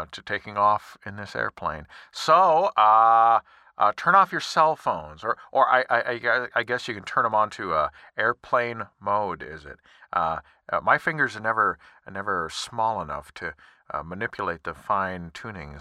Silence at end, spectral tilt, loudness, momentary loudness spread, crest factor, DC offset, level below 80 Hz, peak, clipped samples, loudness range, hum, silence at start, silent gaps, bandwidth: 0 s; -4 dB/octave; -23 LUFS; 17 LU; 20 dB; under 0.1%; -56 dBFS; -4 dBFS; under 0.1%; 9 LU; none; 0 s; none; 13.5 kHz